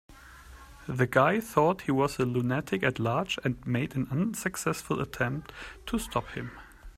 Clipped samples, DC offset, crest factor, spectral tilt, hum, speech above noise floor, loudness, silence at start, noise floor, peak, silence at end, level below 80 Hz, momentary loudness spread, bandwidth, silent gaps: under 0.1%; under 0.1%; 22 dB; -5.5 dB/octave; none; 21 dB; -29 LUFS; 0.1 s; -50 dBFS; -8 dBFS; 0.05 s; -52 dBFS; 14 LU; 16 kHz; none